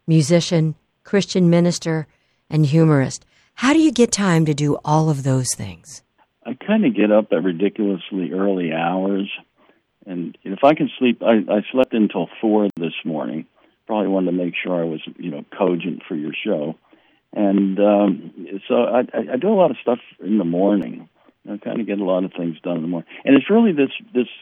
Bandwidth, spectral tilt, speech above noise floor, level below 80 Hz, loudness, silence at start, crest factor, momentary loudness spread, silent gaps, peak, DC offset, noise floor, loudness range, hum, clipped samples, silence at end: 13 kHz; -6 dB/octave; 40 dB; -60 dBFS; -19 LUFS; 0.05 s; 18 dB; 14 LU; none; -2 dBFS; under 0.1%; -58 dBFS; 5 LU; none; under 0.1%; 0.05 s